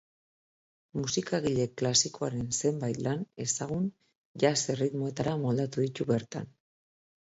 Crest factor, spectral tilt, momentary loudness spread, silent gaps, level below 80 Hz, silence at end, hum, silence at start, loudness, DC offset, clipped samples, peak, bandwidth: 22 dB; -4.5 dB/octave; 10 LU; 4.17-4.35 s; -62 dBFS; 0.8 s; none; 0.95 s; -30 LUFS; under 0.1%; under 0.1%; -10 dBFS; 8 kHz